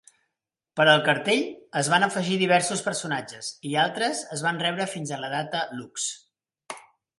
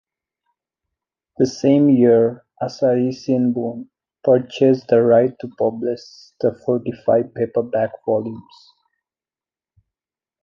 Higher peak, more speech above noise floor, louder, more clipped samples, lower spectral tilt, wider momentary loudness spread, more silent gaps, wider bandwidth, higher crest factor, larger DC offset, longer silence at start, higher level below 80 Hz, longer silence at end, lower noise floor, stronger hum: about the same, -4 dBFS vs -4 dBFS; second, 60 dB vs over 72 dB; second, -25 LUFS vs -18 LUFS; neither; second, -3 dB/octave vs -7.5 dB/octave; first, 15 LU vs 12 LU; neither; first, 11.5 kHz vs 7.2 kHz; first, 22 dB vs 16 dB; neither; second, 0.75 s vs 1.4 s; second, -74 dBFS vs -64 dBFS; second, 0.4 s vs 2.05 s; second, -84 dBFS vs under -90 dBFS; neither